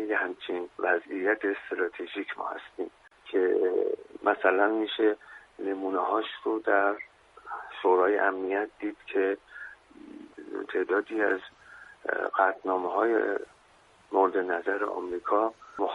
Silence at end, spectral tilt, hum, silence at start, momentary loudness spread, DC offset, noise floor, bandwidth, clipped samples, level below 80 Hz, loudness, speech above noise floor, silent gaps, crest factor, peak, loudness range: 0 s; -5 dB/octave; none; 0 s; 15 LU; under 0.1%; -60 dBFS; 6.8 kHz; under 0.1%; -72 dBFS; -29 LUFS; 32 dB; none; 20 dB; -8 dBFS; 4 LU